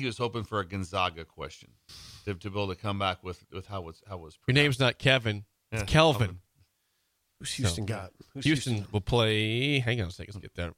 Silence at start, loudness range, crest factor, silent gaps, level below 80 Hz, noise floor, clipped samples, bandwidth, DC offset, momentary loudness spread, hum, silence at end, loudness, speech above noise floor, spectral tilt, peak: 0 s; 7 LU; 24 dB; none; -50 dBFS; -75 dBFS; under 0.1%; 15.5 kHz; under 0.1%; 19 LU; none; 0.05 s; -28 LUFS; 46 dB; -5 dB/octave; -6 dBFS